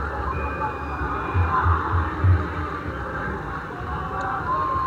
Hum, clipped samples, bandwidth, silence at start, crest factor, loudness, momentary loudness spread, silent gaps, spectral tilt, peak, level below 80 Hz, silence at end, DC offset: none; under 0.1%; 7 kHz; 0 s; 16 dB; -25 LUFS; 8 LU; none; -8 dB/octave; -8 dBFS; -32 dBFS; 0 s; under 0.1%